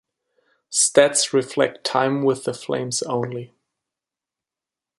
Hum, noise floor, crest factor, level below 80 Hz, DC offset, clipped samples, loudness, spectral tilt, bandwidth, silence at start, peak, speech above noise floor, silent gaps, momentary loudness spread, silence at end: none; -88 dBFS; 22 dB; -68 dBFS; under 0.1%; under 0.1%; -20 LUFS; -3 dB/octave; 11.5 kHz; 0.7 s; -2 dBFS; 68 dB; none; 11 LU; 1.55 s